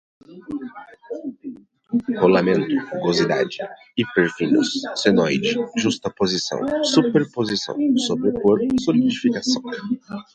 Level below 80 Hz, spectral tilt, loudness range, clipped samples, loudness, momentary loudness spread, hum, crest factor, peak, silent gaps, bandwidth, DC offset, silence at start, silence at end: -58 dBFS; -5 dB/octave; 2 LU; under 0.1%; -20 LUFS; 14 LU; none; 20 dB; -2 dBFS; none; 9 kHz; under 0.1%; 0.3 s; 0.1 s